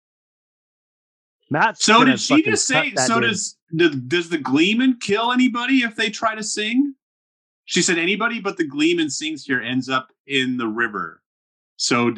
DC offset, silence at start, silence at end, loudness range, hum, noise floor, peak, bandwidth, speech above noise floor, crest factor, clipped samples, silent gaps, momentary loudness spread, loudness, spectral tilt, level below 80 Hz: under 0.1%; 1.5 s; 0 s; 5 LU; none; under -90 dBFS; -2 dBFS; 11 kHz; over 71 dB; 20 dB; under 0.1%; 3.62-3.67 s, 7.02-7.64 s, 10.20-10.25 s, 11.26-11.76 s; 8 LU; -19 LUFS; -3 dB/octave; -70 dBFS